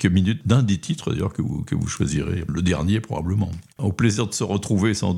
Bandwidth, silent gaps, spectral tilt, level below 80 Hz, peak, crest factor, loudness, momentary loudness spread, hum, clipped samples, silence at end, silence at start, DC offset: 12.5 kHz; none; -6 dB/octave; -44 dBFS; -4 dBFS; 18 dB; -23 LUFS; 6 LU; none; under 0.1%; 0 s; 0 s; under 0.1%